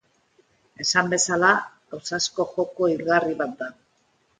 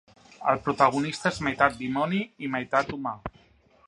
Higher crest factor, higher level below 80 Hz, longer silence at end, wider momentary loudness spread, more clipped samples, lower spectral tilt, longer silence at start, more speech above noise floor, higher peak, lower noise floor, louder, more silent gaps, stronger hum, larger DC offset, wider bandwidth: about the same, 22 dB vs 22 dB; second, -66 dBFS vs -56 dBFS; about the same, 0.7 s vs 0.6 s; first, 16 LU vs 11 LU; neither; second, -2.5 dB/octave vs -5.5 dB/octave; first, 0.8 s vs 0.4 s; first, 43 dB vs 34 dB; about the same, -2 dBFS vs -4 dBFS; first, -66 dBFS vs -60 dBFS; first, -22 LUFS vs -26 LUFS; neither; neither; neither; second, 9.6 kHz vs 11.5 kHz